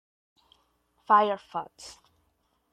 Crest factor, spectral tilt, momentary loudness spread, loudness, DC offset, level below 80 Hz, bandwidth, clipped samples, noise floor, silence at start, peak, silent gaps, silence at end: 22 dB; -4 dB/octave; 24 LU; -25 LUFS; under 0.1%; -74 dBFS; 11 kHz; under 0.1%; -73 dBFS; 1.1 s; -8 dBFS; none; 0.8 s